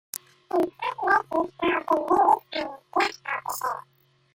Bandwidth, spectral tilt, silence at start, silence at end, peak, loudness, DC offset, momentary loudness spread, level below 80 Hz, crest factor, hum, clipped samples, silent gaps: 16.5 kHz; -3 dB/octave; 0.15 s; 0.55 s; -6 dBFS; -25 LUFS; under 0.1%; 12 LU; -64 dBFS; 20 dB; none; under 0.1%; none